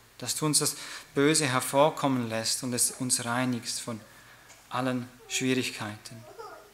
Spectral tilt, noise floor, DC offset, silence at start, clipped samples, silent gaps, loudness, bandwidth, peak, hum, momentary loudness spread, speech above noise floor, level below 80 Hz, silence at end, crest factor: -3 dB/octave; -53 dBFS; under 0.1%; 0.2 s; under 0.1%; none; -28 LUFS; 16 kHz; -8 dBFS; none; 15 LU; 25 dB; -70 dBFS; 0.1 s; 20 dB